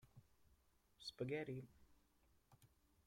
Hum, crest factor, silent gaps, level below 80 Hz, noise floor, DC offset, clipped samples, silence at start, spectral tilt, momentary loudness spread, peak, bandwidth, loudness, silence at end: none; 20 dB; none; -78 dBFS; -77 dBFS; under 0.1%; under 0.1%; 0.05 s; -6 dB/octave; 10 LU; -34 dBFS; 16.5 kHz; -50 LUFS; 0.4 s